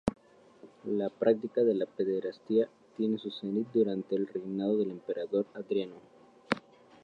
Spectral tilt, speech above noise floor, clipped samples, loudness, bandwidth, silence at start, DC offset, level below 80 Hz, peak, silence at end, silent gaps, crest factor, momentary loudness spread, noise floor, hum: -7.5 dB/octave; 26 dB; under 0.1%; -32 LUFS; 9.4 kHz; 0.05 s; under 0.1%; -64 dBFS; -8 dBFS; 0.45 s; none; 24 dB; 7 LU; -57 dBFS; none